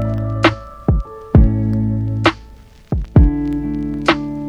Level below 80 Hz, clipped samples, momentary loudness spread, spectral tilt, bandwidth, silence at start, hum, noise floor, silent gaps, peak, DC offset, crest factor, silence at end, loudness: -22 dBFS; under 0.1%; 9 LU; -7.5 dB/octave; 8.8 kHz; 0 s; none; -41 dBFS; none; 0 dBFS; under 0.1%; 16 dB; 0 s; -17 LUFS